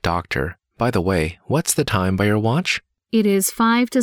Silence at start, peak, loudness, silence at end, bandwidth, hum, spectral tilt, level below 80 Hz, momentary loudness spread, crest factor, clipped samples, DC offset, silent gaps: 0.05 s; -4 dBFS; -20 LUFS; 0 s; 19.5 kHz; none; -5 dB/octave; -42 dBFS; 7 LU; 14 dB; under 0.1%; under 0.1%; none